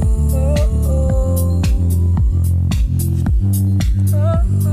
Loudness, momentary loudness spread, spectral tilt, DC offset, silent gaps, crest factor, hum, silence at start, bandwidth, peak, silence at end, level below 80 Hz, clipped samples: -16 LUFS; 1 LU; -7.5 dB/octave; under 0.1%; none; 8 dB; none; 0 s; 15.5 kHz; -6 dBFS; 0 s; -18 dBFS; under 0.1%